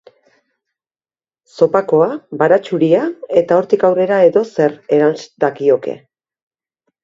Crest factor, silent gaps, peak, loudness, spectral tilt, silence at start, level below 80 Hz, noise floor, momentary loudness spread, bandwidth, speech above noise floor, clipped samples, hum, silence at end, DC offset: 16 dB; none; 0 dBFS; -14 LUFS; -7.5 dB/octave; 1.55 s; -62 dBFS; under -90 dBFS; 6 LU; 7.6 kHz; over 76 dB; under 0.1%; none; 1.1 s; under 0.1%